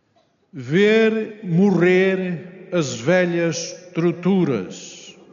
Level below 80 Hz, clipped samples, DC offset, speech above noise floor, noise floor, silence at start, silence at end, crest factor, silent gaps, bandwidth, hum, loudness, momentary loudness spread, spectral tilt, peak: -66 dBFS; under 0.1%; under 0.1%; 43 dB; -62 dBFS; 0.55 s; 0.2 s; 16 dB; none; 7.4 kHz; none; -19 LUFS; 17 LU; -6 dB/octave; -4 dBFS